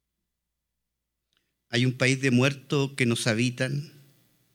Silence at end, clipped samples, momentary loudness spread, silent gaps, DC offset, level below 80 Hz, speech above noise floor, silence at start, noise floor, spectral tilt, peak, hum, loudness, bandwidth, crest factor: 0.65 s; under 0.1%; 8 LU; none; under 0.1%; -74 dBFS; 58 dB; 1.7 s; -83 dBFS; -5 dB/octave; -6 dBFS; none; -25 LUFS; 15.5 kHz; 22 dB